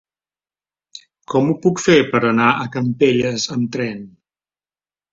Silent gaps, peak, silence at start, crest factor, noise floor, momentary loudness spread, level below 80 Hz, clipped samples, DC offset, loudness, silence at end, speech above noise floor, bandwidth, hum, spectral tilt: none; -2 dBFS; 0.95 s; 18 dB; under -90 dBFS; 9 LU; -56 dBFS; under 0.1%; under 0.1%; -17 LUFS; 1.05 s; over 73 dB; 7.8 kHz; none; -5 dB/octave